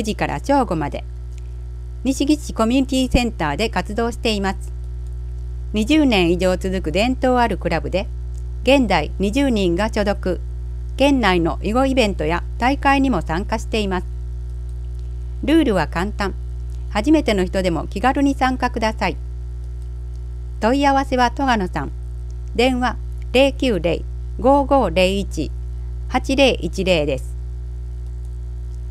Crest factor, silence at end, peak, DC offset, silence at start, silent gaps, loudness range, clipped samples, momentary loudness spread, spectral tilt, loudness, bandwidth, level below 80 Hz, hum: 18 dB; 0 s; -2 dBFS; under 0.1%; 0 s; none; 3 LU; under 0.1%; 15 LU; -5.5 dB/octave; -19 LUFS; 14.5 kHz; -28 dBFS; 60 Hz at -25 dBFS